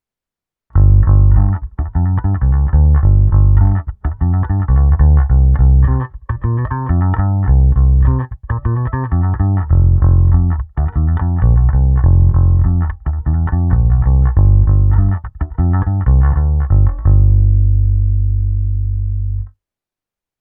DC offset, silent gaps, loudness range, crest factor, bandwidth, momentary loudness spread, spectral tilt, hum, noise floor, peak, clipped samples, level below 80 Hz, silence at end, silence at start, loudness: under 0.1%; none; 2 LU; 12 dB; 2.1 kHz; 8 LU; -14.5 dB/octave; 50 Hz at -35 dBFS; -88 dBFS; 0 dBFS; under 0.1%; -14 dBFS; 0.9 s; 0.75 s; -14 LUFS